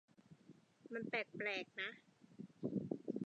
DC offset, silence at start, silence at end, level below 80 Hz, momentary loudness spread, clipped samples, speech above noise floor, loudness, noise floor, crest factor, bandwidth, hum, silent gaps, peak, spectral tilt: under 0.1%; 0.3 s; 0 s; -86 dBFS; 22 LU; under 0.1%; 22 dB; -45 LUFS; -67 dBFS; 20 dB; 9.2 kHz; none; none; -26 dBFS; -6 dB/octave